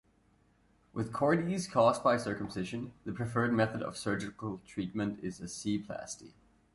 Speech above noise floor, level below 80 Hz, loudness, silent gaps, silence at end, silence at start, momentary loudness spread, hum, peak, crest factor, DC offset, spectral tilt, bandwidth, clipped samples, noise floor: 35 dB; -62 dBFS; -33 LUFS; none; 0.45 s; 0.95 s; 14 LU; none; -14 dBFS; 20 dB; under 0.1%; -5.5 dB/octave; 11.5 kHz; under 0.1%; -68 dBFS